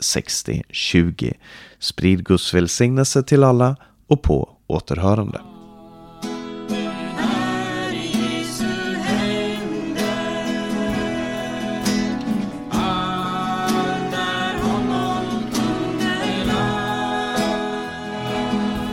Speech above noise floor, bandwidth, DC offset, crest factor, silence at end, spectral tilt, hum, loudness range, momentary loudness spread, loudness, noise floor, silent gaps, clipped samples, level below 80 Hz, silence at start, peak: 24 dB; 16.5 kHz; under 0.1%; 20 dB; 0 s; -5 dB/octave; none; 6 LU; 9 LU; -21 LUFS; -42 dBFS; none; under 0.1%; -38 dBFS; 0 s; -2 dBFS